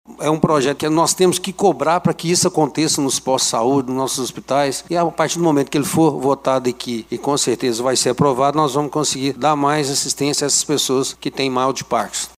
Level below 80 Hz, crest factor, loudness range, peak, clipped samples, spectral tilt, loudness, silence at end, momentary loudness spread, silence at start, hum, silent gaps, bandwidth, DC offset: -56 dBFS; 18 dB; 2 LU; 0 dBFS; under 0.1%; -4 dB/octave; -17 LUFS; 0.1 s; 5 LU; 0.1 s; none; none; 16 kHz; under 0.1%